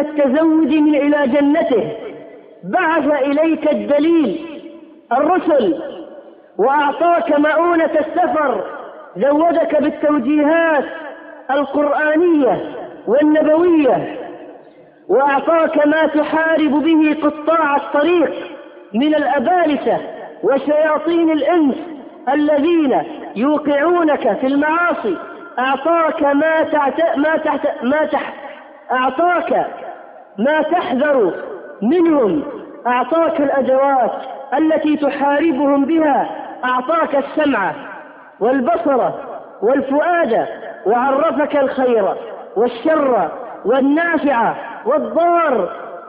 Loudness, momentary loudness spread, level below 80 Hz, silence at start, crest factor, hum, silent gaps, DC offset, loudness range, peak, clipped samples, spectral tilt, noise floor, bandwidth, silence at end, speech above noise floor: -16 LUFS; 13 LU; -58 dBFS; 0 s; 12 dB; none; none; under 0.1%; 2 LU; -4 dBFS; under 0.1%; -10.5 dB/octave; -43 dBFS; 4.8 kHz; 0 s; 28 dB